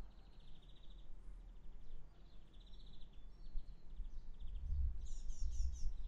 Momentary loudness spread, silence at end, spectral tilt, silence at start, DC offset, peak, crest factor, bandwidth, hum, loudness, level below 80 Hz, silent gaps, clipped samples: 18 LU; 0 s; -5.5 dB/octave; 0 s; under 0.1%; -28 dBFS; 16 dB; 7.6 kHz; none; -52 LUFS; -46 dBFS; none; under 0.1%